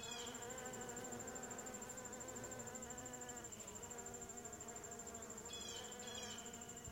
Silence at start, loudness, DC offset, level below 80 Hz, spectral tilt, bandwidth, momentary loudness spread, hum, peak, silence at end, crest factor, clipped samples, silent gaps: 0 s; -49 LUFS; under 0.1%; -70 dBFS; -2 dB/octave; 16.5 kHz; 3 LU; none; -36 dBFS; 0 s; 16 dB; under 0.1%; none